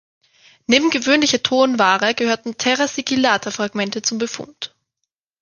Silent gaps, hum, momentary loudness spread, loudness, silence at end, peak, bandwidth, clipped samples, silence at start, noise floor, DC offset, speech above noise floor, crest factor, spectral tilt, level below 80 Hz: none; none; 13 LU; -17 LUFS; 0.75 s; 0 dBFS; 10 kHz; under 0.1%; 0.7 s; -79 dBFS; under 0.1%; 61 dB; 18 dB; -2.5 dB/octave; -62 dBFS